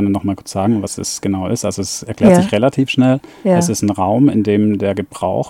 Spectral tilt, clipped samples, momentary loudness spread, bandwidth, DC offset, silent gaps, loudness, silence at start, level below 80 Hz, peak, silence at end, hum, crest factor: -6 dB/octave; under 0.1%; 9 LU; 16 kHz; under 0.1%; none; -15 LUFS; 0 s; -48 dBFS; 0 dBFS; 0 s; none; 14 dB